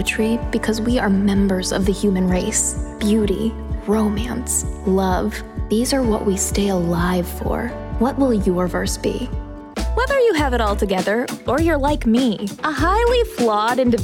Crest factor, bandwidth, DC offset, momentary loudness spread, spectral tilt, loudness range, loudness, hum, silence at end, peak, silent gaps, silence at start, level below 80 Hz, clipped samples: 12 dB; 17.5 kHz; under 0.1%; 7 LU; -5 dB/octave; 2 LU; -19 LUFS; none; 0 s; -6 dBFS; none; 0 s; -30 dBFS; under 0.1%